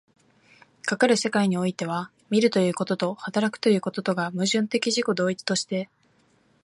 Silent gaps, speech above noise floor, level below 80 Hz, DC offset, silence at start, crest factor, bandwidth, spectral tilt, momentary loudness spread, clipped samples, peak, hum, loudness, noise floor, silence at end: none; 39 dB; -72 dBFS; under 0.1%; 0.85 s; 20 dB; 11.5 kHz; -4.5 dB/octave; 9 LU; under 0.1%; -6 dBFS; none; -24 LUFS; -63 dBFS; 0.8 s